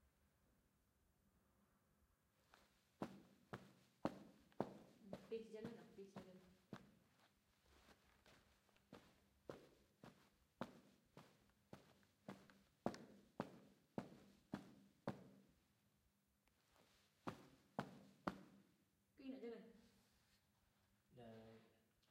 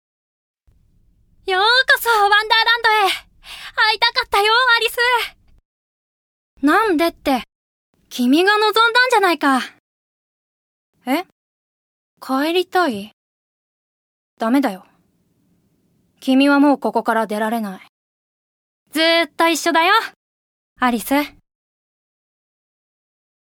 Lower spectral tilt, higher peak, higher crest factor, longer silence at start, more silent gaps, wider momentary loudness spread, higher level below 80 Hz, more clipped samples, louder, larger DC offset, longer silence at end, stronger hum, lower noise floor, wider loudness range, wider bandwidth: first, -6.5 dB/octave vs -2.5 dB/octave; second, -26 dBFS vs 0 dBFS; first, 34 dB vs 20 dB; second, 0 s vs 1.45 s; second, none vs 5.65-6.57 s, 7.55-7.93 s, 9.79-10.93 s, 11.32-12.17 s, 13.13-14.37 s, 17.89-18.86 s, 20.16-20.76 s; about the same, 16 LU vs 14 LU; second, -84 dBFS vs -58 dBFS; neither; second, -57 LUFS vs -16 LUFS; neither; second, 0.3 s vs 2.15 s; neither; first, -84 dBFS vs -62 dBFS; about the same, 10 LU vs 9 LU; second, 15.5 kHz vs over 20 kHz